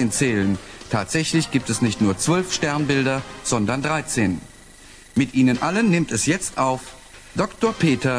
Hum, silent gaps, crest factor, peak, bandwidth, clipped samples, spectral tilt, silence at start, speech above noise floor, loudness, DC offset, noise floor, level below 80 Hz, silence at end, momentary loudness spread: none; none; 16 dB; -6 dBFS; 11 kHz; under 0.1%; -4.5 dB/octave; 0 s; 24 dB; -21 LUFS; under 0.1%; -45 dBFS; -48 dBFS; 0 s; 7 LU